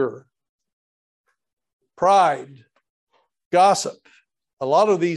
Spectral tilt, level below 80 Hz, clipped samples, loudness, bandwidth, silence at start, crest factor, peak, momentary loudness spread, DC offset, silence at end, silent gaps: -4.5 dB/octave; -70 dBFS; under 0.1%; -19 LUFS; 12.5 kHz; 0 s; 18 dB; -4 dBFS; 14 LU; under 0.1%; 0 s; 0.49-0.59 s, 0.73-1.24 s, 1.53-1.57 s, 1.73-1.79 s, 2.90-3.07 s, 3.46-3.51 s, 4.53-4.57 s